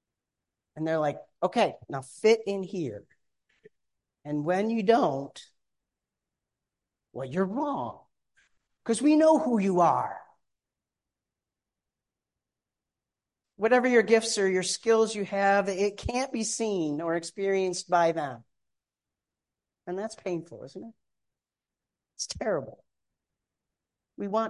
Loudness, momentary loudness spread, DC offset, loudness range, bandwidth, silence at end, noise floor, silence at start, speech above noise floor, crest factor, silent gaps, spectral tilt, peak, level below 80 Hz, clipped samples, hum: -27 LUFS; 17 LU; under 0.1%; 13 LU; 11.5 kHz; 0 s; under -90 dBFS; 0.75 s; over 63 dB; 22 dB; none; -4.5 dB/octave; -8 dBFS; -60 dBFS; under 0.1%; none